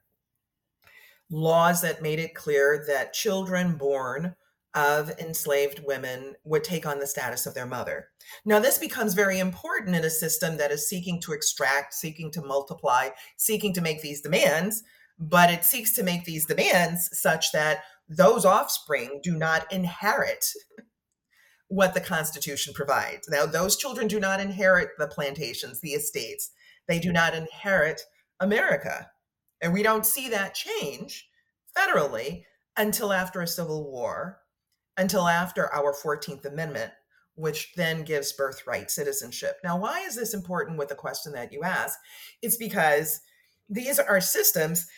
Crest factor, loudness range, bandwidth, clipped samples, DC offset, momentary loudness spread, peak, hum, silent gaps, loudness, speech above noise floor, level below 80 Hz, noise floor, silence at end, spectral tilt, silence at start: 22 dB; 6 LU; 18 kHz; under 0.1%; under 0.1%; 12 LU; -6 dBFS; none; none; -26 LUFS; 57 dB; -64 dBFS; -83 dBFS; 0.05 s; -3.5 dB/octave; 1.3 s